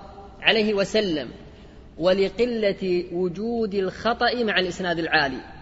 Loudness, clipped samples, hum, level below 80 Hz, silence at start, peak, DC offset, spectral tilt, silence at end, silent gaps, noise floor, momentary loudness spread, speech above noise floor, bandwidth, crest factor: -23 LUFS; under 0.1%; none; -48 dBFS; 0 s; -2 dBFS; under 0.1%; -5 dB/octave; 0 s; none; -45 dBFS; 7 LU; 22 dB; 8 kHz; 22 dB